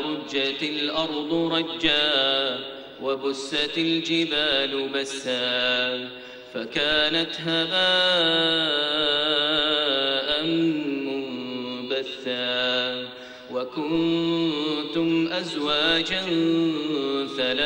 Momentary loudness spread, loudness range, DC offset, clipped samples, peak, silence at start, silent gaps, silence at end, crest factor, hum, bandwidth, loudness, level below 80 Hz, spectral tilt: 11 LU; 5 LU; under 0.1%; under 0.1%; -6 dBFS; 0 s; none; 0 s; 18 dB; none; 16 kHz; -23 LUFS; -58 dBFS; -4 dB/octave